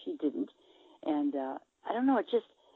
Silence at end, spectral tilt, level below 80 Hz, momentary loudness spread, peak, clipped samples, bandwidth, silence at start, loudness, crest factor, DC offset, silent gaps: 0.35 s; -7.5 dB/octave; -86 dBFS; 12 LU; -16 dBFS; under 0.1%; 4.1 kHz; 0 s; -33 LUFS; 16 dB; under 0.1%; none